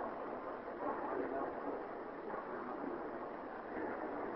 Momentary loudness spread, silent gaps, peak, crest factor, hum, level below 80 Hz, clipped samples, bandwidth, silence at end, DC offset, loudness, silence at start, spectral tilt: 5 LU; none; -28 dBFS; 16 dB; none; -70 dBFS; under 0.1%; 5.6 kHz; 0 s; under 0.1%; -44 LUFS; 0 s; -5 dB/octave